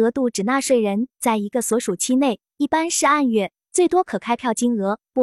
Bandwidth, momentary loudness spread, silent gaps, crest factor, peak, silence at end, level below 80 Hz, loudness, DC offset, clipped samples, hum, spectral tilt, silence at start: 14 kHz; 6 LU; none; 14 dB; -6 dBFS; 0 s; -62 dBFS; -20 LUFS; under 0.1%; under 0.1%; none; -4 dB/octave; 0 s